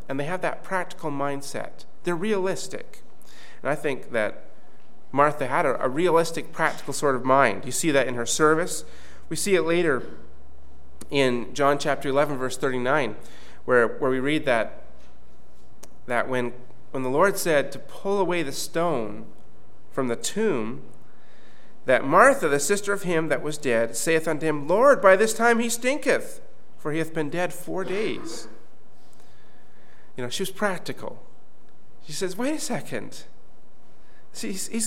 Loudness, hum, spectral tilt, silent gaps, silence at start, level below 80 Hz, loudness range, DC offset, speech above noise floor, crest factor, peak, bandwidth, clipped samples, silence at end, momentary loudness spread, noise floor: -24 LUFS; none; -4 dB/octave; none; 0.1 s; -60 dBFS; 11 LU; 4%; 34 dB; 24 dB; -2 dBFS; 17 kHz; under 0.1%; 0 s; 15 LU; -58 dBFS